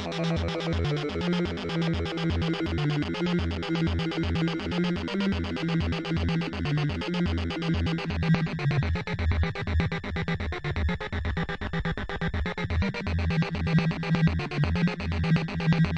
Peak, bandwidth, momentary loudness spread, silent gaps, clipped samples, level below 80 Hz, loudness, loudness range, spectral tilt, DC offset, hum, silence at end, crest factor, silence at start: -12 dBFS; 8.2 kHz; 5 LU; none; under 0.1%; -40 dBFS; -28 LUFS; 3 LU; -7 dB/octave; under 0.1%; none; 0 s; 16 dB; 0 s